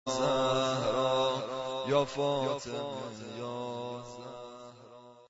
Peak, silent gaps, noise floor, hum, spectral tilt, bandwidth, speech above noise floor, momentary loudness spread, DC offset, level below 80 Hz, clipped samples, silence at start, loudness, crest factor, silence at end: -14 dBFS; none; -53 dBFS; none; -4.5 dB/octave; 8 kHz; 22 dB; 17 LU; under 0.1%; -66 dBFS; under 0.1%; 0.05 s; -32 LUFS; 18 dB; 0.05 s